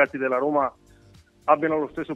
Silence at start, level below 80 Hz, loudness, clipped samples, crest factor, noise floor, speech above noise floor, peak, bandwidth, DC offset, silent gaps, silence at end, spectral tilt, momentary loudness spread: 0 s; -60 dBFS; -24 LUFS; under 0.1%; 20 dB; -54 dBFS; 30 dB; -4 dBFS; 8 kHz; under 0.1%; none; 0 s; -7.5 dB/octave; 7 LU